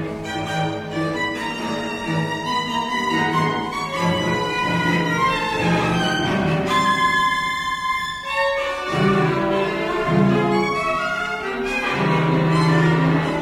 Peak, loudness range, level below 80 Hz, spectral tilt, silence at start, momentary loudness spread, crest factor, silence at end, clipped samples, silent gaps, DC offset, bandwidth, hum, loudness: -6 dBFS; 3 LU; -46 dBFS; -5.5 dB/octave; 0 s; 7 LU; 14 dB; 0 s; under 0.1%; none; under 0.1%; 14 kHz; none; -20 LUFS